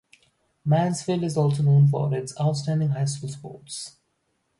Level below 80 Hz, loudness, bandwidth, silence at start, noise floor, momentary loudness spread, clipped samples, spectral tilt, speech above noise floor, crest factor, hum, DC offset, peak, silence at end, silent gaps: -62 dBFS; -23 LUFS; 11.5 kHz; 0.65 s; -73 dBFS; 17 LU; under 0.1%; -7 dB/octave; 50 dB; 14 dB; none; under 0.1%; -10 dBFS; 0.7 s; none